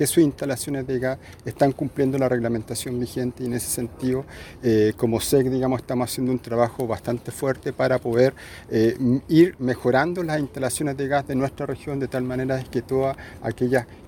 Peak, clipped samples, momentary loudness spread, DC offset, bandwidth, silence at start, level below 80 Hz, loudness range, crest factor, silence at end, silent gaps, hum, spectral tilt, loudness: -4 dBFS; under 0.1%; 8 LU; under 0.1%; 19 kHz; 0 s; -50 dBFS; 4 LU; 18 dB; 0 s; none; none; -6 dB/octave; -23 LUFS